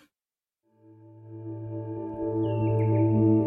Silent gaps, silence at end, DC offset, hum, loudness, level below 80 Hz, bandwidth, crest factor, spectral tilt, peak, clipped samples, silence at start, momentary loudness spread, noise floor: none; 0 s; under 0.1%; none; -27 LUFS; -56 dBFS; 3.1 kHz; 16 dB; -12.5 dB/octave; -12 dBFS; under 0.1%; 1.05 s; 18 LU; under -90 dBFS